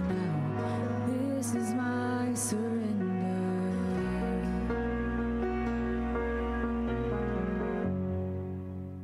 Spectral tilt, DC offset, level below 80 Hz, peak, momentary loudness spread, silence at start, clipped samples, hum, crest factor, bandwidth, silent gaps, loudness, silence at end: -6.5 dB/octave; under 0.1%; -42 dBFS; -20 dBFS; 2 LU; 0 s; under 0.1%; none; 12 dB; 15 kHz; none; -32 LUFS; 0 s